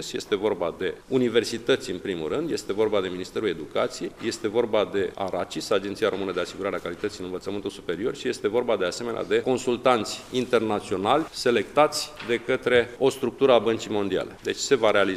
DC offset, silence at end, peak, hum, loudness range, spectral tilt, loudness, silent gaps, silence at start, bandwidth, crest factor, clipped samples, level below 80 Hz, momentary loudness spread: under 0.1%; 0 s; -4 dBFS; none; 5 LU; -4 dB/octave; -25 LUFS; none; 0 s; 15 kHz; 20 dB; under 0.1%; -56 dBFS; 9 LU